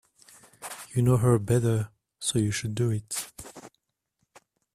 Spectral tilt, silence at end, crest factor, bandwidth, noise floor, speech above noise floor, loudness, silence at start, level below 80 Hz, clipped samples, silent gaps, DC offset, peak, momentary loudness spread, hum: -5.5 dB/octave; 1.05 s; 18 dB; 15 kHz; -77 dBFS; 53 dB; -26 LUFS; 0.6 s; -56 dBFS; under 0.1%; none; under 0.1%; -10 dBFS; 18 LU; none